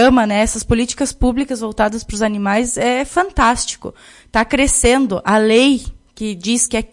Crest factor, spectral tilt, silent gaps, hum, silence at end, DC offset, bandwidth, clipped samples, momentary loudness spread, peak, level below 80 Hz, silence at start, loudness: 16 dB; -3.5 dB/octave; none; none; 0.05 s; under 0.1%; 11.5 kHz; under 0.1%; 10 LU; 0 dBFS; -30 dBFS; 0 s; -16 LUFS